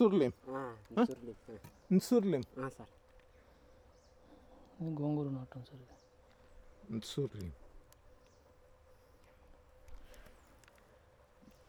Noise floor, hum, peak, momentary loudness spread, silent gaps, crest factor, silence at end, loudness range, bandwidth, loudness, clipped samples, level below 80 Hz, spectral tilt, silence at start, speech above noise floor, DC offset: -65 dBFS; none; -18 dBFS; 27 LU; none; 22 dB; 1.4 s; 11 LU; over 20 kHz; -37 LUFS; under 0.1%; -64 dBFS; -7 dB/octave; 0 s; 29 dB; under 0.1%